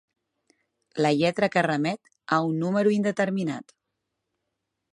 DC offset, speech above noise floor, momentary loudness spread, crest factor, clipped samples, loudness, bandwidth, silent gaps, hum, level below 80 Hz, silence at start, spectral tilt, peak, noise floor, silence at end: under 0.1%; 57 dB; 10 LU; 18 dB; under 0.1%; -25 LUFS; 11 kHz; none; none; -70 dBFS; 0.95 s; -6.5 dB/octave; -8 dBFS; -82 dBFS; 1.3 s